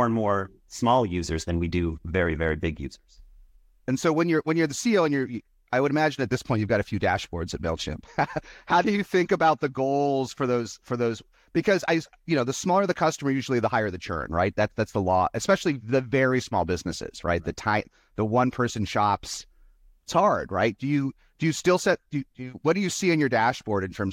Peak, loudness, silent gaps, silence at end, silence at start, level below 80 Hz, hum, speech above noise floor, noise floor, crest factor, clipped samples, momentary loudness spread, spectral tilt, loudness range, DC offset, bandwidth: -8 dBFS; -25 LUFS; none; 0 s; 0 s; -50 dBFS; none; 31 dB; -56 dBFS; 16 dB; under 0.1%; 9 LU; -5.5 dB/octave; 2 LU; under 0.1%; 16.5 kHz